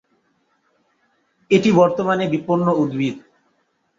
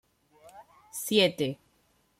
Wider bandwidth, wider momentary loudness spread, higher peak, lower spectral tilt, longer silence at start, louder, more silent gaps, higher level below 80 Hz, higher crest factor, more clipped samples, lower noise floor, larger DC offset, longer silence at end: second, 7.6 kHz vs 16.5 kHz; second, 9 LU vs 18 LU; first, -2 dBFS vs -10 dBFS; first, -7 dB/octave vs -3.5 dB/octave; first, 1.5 s vs 0.45 s; first, -18 LUFS vs -27 LUFS; neither; first, -62 dBFS vs -72 dBFS; about the same, 18 dB vs 22 dB; neither; about the same, -66 dBFS vs -69 dBFS; neither; first, 0.8 s vs 0.65 s